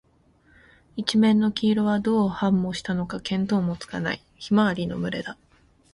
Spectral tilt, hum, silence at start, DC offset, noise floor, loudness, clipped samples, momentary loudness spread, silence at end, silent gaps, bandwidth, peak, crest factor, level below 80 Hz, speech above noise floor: -6.5 dB/octave; none; 0.95 s; under 0.1%; -60 dBFS; -24 LUFS; under 0.1%; 10 LU; 0.6 s; none; 11 kHz; -6 dBFS; 18 dB; -54 dBFS; 37 dB